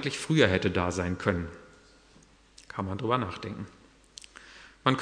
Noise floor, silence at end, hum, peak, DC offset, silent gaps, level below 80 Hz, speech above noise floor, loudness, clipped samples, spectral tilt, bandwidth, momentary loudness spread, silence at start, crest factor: -58 dBFS; 0 s; none; -6 dBFS; under 0.1%; none; -54 dBFS; 30 dB; -29 LUFS; under 0.1%; -5.5 dB/octave; 10.5 kHz; 24 LU; 0 s; 24 dB